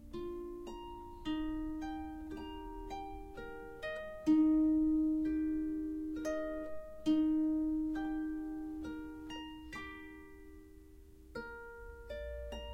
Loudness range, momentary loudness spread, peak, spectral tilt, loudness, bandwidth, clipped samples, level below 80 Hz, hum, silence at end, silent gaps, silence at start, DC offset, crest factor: 14 LU; 17 LU; -20 dBFS; -6.5 dB/octave; -37 LUFS; 8 kHz; under 0.1%; -54 dBFS; none; 0 s; none; 0 s; under 0.1%; 16 dB